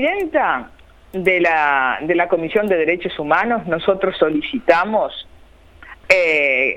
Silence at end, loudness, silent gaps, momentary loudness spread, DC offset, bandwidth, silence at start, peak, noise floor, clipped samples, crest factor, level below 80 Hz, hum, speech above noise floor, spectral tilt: 0 s; -17 LUFS; none; 6 LU; under 0.1%; 15.5 kHz; 0 s; 0 dBFS; -45 dBFS; under 0.1%; 18 dB; -50 dBFS; none; 28 dB; -5.5 dB/octave